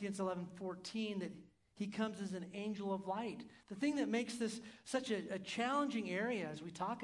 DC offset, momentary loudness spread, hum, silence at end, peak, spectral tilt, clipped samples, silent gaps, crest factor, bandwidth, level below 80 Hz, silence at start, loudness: under 0.1%; 9 LU; none; 0 s; -24 dBFS; -5 dB/octave; under 0.1%; none; 18 dB; 12 kHz; -82 dBFS; 0 s; -41 LUFS